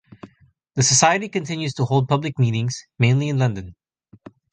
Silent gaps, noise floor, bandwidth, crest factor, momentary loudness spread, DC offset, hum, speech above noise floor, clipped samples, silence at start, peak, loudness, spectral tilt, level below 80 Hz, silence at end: none; -57 dBFS; 9.6 kHz; 20 dB; 11 LU; under 0.1%; none; 37 dB; under 0.1%; 0.25 s; -2 dBFS; -20 LUFS; -4 dB/octave; -52 dBFS; 0.8 s